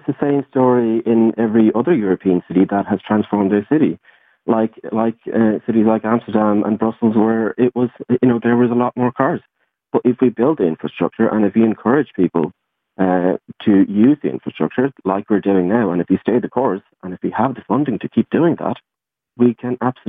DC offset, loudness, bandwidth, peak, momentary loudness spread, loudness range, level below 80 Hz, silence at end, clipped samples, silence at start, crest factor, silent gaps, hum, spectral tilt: under 0.1%; -17 LUFS; 3.8 kHz; -2 dBFS; 7 LU; 2 LU; -60 dBFS; 0.15 s; under 0.1%; 0.05 s; 16 dB; none; none; -11.5 dB/octave